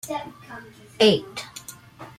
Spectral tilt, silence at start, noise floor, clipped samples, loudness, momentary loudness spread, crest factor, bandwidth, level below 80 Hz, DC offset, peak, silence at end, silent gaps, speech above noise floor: -4 dB/octave; 0.05 s; -43 dBFS; under 0.1%; -21 LUFS; 23 LU; 20 dB; 16 kHz; -62 dBFS; under 0.1%; -6 dBFS; 0.1 s; none; 19 dB